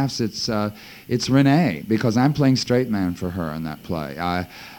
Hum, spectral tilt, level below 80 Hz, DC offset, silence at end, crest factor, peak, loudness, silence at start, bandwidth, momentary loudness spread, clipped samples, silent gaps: none; -6 dB/octave; -50 dBFS; under 0.1%; 0 s; 16 dB; -6 dBFS; -21 LUFS; 0 s; 17.5 kHz; 11 LU; under 0.1%; none